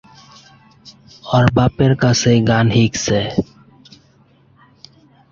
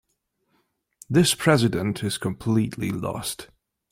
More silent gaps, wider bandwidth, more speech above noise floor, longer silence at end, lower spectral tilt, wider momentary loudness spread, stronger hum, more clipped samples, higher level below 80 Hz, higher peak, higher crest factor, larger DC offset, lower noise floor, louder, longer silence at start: neither; second, 7.6 kHz vs 16.5 kHz; second, 38 dB vs 51 dB; first, 1.9 s vs 0.45 s; about the same, -5.5 dB/octave vs -5 dB/octave; about the same, 9 LU vs 11 LU; neither; neither; first, -42 dBFS vs -54 dBFS; first, 0 dBFS vs -4 dBFS; second, 16 dB vs 22 dB; neither; second, -52 dBFS vs -74 dBFS; first, -15 LUFS vs -23 LUFS; second, 0.85 s vs 1.1 s